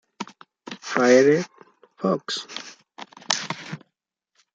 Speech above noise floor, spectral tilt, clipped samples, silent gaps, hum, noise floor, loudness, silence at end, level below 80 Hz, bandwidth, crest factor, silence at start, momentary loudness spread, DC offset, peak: 59 dB; -4 dB/octave; under 0.1%; none; none; -78 dBFS; -22 LUFS; 0.8 s; -74 dBFS; 9.2 kHz; 22 dB; 0.2 s; 25 LU; under 0.1%; -2 dBFS